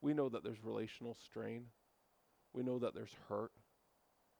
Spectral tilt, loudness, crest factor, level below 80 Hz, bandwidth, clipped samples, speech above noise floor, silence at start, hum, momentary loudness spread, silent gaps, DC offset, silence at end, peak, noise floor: -7.5 dB/octave; -45 LUFS; 18 dB; -82 dBFS; over 20 kHz; under 0.1%; 33 dB; 0 s; none; 12 LU; none; under 0.1%; 0.9 s; -26 dBFS; -77 dBFS